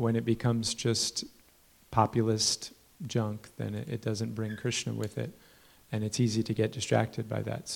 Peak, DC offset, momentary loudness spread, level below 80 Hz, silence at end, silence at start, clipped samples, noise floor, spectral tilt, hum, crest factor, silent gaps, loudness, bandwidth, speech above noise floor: -8 dBFS; under 0.1%; 11 LU; -62 dBFS; 0 s; 0 s; under 0.1%; -62 dBFS; -4.5 dB/octave; none; 22 dB; none; -31 LUFS; 17 kHz; 31 dB